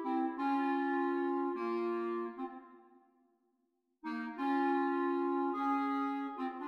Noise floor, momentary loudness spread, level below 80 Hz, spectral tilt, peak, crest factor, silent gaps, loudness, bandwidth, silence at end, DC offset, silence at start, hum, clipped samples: -80 dBFS; 10 LU; -88 dBFS; -6 dB/octave; -22 dBFS; 14 dB; none; -35 LUFS; 5.8 kHz; 0 s; under 0.1%; 0 s; none; under 0.1%